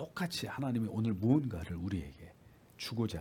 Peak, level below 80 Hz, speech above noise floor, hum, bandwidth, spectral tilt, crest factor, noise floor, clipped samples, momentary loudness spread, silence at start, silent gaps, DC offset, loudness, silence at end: -16 dBFS; -60 dBFS; 26 dB; none; 18 kHz; -6.5 dB/octave; 20 dB; -60 dBFS; under 0.1%; 12 LU; 0 s; none; under 0.1%; -36 LUFS; 0 s